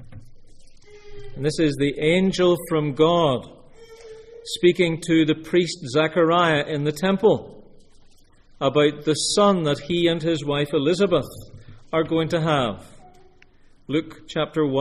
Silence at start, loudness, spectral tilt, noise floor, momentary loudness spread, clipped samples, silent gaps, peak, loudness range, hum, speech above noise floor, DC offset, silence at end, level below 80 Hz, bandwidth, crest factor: 0 s; -21 LUFS; -5.5 dB/octave; -51 dBFS; 9 LU; under 0.1%; none; -4 dBFS; 3 LU; none; 31 dB; under 0.1%; 0 s; -50 dBFS; 13 kHz; 18 dB